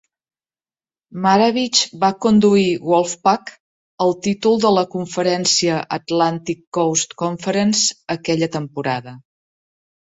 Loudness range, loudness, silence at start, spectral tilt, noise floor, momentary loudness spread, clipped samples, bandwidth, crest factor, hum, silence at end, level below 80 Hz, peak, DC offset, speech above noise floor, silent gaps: 3 LU; -18 LUFS; 1.15 s; -4 dB/octave; under -90 dBFS; 9 LU; under 0.1%; 8.2 kHz; 18 dB; none; 0.9 s; -60 dBFS; -2 dBFS; under 0.1%; over 72 dB; 3.60-3.98 s, 6.67-6.72 s